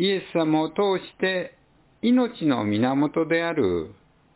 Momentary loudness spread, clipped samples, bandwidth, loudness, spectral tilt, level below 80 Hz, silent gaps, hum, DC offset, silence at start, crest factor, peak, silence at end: 7 LU; under 0.1%; 4 kHz; -24 LUFS; -10.5 dB/octave; -56 dBFS; none; none; under 0.1%; 0 s; 14 dB; -10 dBFS; 0.45 s